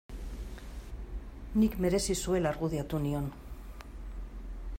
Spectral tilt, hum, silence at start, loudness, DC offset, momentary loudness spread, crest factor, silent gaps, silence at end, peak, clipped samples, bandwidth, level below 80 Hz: -5.5 dB/octave; none; 0.1 s; -32 LUFS; under 0.1%; 18 LU; 16 dB; none; 0.05 s; -16 dBFS; under 0.1%; 16 kHz; -42 dBFS